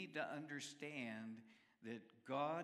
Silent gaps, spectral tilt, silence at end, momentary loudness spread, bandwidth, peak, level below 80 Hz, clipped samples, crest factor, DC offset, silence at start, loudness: none; -4.5 dB/octave; 0 s; 14 LU; 14 kHz; -30 dBFS; under -90 dBFS; under 0.1%; 20 dB; under 0.1%; 0 s; -49 LUFS